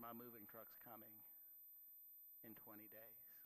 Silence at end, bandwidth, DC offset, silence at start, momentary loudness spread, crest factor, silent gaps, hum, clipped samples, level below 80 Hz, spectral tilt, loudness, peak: 0 s; 14 kHz; under 0.1%; 0 s; 3 LU; 18 dB; none; none; under 0.1%; under -90 dBFS; -6.5 dB/octave; -59 LUFS; -44 dBFS